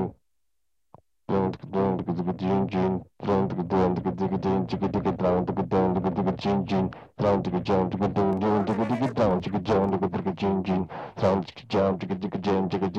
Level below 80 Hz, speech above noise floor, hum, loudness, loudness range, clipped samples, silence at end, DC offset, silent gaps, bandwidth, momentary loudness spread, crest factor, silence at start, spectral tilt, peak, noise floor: -52 dBFS; 58 dB; none; -26 LUFS; 2 LU; under 0.1%; 0 s; under 0.1%; none; 7.2 kHz; 5 LU; 16 dB; 0 s; -8.5 dB/octave; -10 dBFS; -83 dBFS